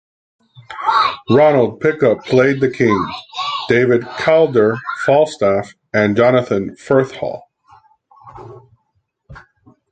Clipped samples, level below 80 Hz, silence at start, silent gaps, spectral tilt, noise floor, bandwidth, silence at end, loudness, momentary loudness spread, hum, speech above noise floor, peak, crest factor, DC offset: under 0.1%; -52 dBFS; 0.7 s; none; -6.5 dB/octave; -67 dBFS; 9.2 kHz; 0.55 s; -15 LUFS; 10 LU; none; 53 dB; 0 dBFS; 16 dB; under 0.1%